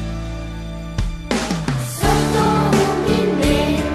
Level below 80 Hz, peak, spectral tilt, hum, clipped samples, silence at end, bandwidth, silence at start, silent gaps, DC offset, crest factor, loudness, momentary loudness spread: -28 dBFS; -4 dBFS; -5.5 dB/octave; none; under 0.1%; 0 s; 14 kHz; 0 s; none; under 0.1%; 14 dB; -19 LUFS; 12 LU